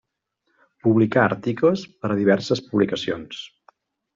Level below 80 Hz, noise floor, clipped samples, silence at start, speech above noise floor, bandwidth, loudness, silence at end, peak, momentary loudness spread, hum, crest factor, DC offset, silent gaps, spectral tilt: -60 dBFS; -74 dBFS; under 0.1%; 0.85 s; 53 dB; 7.6 kHz; -21 LUFS; 0.7 s; -4 dBFS; 13 LU; none; 18 dB; under 0.1%; none; -6.5 dB/octave